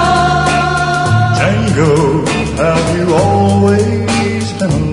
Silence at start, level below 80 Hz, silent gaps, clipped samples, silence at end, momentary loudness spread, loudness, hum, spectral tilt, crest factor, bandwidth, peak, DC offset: 0 s; -30 dBFS; none; under 0.1%; 0 s; 4 LU; -12 LUFS; none; -6 dB/octave; 12 dB; 11 kHz; 0 dBFS; under 0.1%